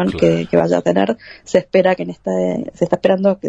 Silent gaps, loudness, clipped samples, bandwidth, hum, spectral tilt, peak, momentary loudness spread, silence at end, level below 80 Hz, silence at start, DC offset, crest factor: none; -17 LUFS; under 0.1%; 8.2 kHz; none; -7 dB/octave; 0 dBFS; 7 LU; 0 s; -46 dBFS; 0 s; under 0.1%; 16 dB